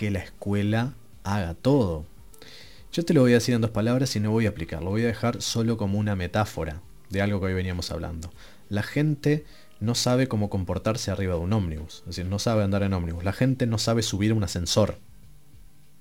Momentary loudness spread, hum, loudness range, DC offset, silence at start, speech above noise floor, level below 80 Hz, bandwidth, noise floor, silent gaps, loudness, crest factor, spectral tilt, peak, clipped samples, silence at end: 11 LU; none; 4 LU; 0.4%; 0 s; 28 dB; -46 dBFS; 16.5 kHz; -53 dBFS; none; -26 LUFS; 20 dB; -5.5 dB/octave; -6 dBFS; under 0.1%; 0.35 s